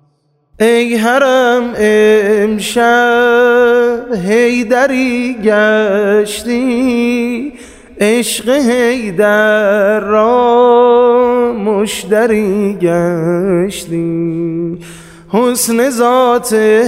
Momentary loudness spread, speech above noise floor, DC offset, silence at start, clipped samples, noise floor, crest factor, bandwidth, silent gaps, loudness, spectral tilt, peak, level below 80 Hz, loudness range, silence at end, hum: 7 LU; 47 dB; under 0.1%; 0.6 s; under 0.1%; -57 dBFS; 10 dB; 16 kHz; none; -11 LUFS; -4.5 dB/octave; 0 dBFS; -46 dBFS; 4 LU; 0 s; none